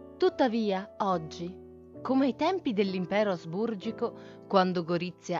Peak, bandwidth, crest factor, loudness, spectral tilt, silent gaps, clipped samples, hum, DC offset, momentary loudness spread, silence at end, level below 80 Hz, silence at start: -10 dBFS; 7.6 kHz; 20 dB; -29 LUFS; -6.5 dB/octave; none; under 0.1%; none; under 0.1%; 14 LU; 0 s; -66 dBFS; 0 s